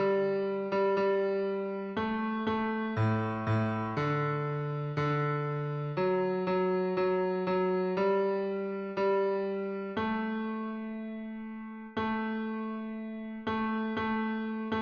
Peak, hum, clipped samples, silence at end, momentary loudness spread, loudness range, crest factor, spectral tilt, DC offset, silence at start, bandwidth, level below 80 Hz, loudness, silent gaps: -18 dBFS; none; under 0.1%; 0 s; 9 LU; 5 LU; 14 dB; -9 dB/octave; under 0.1%; 0 s; 6.4 kHz; -64 dBFS; -32 LUFS; none